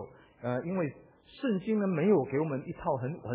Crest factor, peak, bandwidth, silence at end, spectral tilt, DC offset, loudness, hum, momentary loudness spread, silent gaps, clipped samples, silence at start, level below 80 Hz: 16 dB; -16 dBFS; 4 kHz; 0 s; -7.5 dB/octave; under 0.1%; -31 LUFS; none; 10 LU; none; under 0.1%; 0 s; -64 dBFS